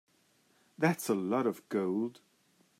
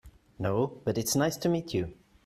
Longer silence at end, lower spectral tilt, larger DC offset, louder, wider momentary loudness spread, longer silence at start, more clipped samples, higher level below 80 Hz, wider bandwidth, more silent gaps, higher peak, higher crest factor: first, 0.7 s vs 0.3 s; about the same, -6 dB/octave vs -5 dB/octave; neither; second, -33 LUFS vs -30 LUFS; about the same, 5 LU vs 7 LU; first, 0.8 s vs 0.05 s; neither; second, -84 dBFS vs -56 dBFS; about the same, 16 kHz vs 15.5 kHz; neither; about the same, -14 dBFS vs -14 dBFS; about the same, 20 dB vs 18 dB